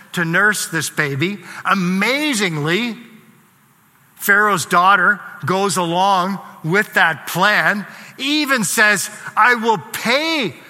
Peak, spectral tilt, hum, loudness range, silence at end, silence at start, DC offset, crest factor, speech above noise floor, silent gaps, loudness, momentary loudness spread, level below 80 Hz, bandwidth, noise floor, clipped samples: 0 dBFS; -3.5 dB/octave; none; 4 LU; 0.1 s; 0.15 s; under 0.1%; 18 dB; 36 dB; none; -16 LUFS; 9 LU; -68 dBFS; 16.5 kHz; -53 dBFS; under 0.1%